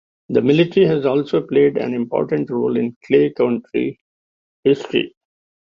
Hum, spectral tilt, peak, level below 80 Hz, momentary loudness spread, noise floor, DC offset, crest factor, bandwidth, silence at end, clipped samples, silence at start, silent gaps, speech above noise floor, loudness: none; -8 dB/octave; -2 dBFS; -58 dBFS; 7 LU; under -90 dBFS; under 0.1%; 16 dB; 7.2 kHz; 0.6 s; under 0.1%; 0.3 s; 2.96-3.01 s, 4.01-4.63 s; over 73 dB; -18 LUFS